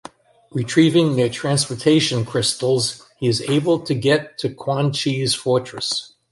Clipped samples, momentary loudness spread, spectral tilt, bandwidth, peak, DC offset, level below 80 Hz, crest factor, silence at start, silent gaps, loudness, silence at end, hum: under 0.1%; 8 LU; -5 dB/octave; 11.5 kHz; -2 dBFS; under 0.1%; -56 dBFS; 16 dB; 0.55 s; none; -19 LUFS; 0.25 s; none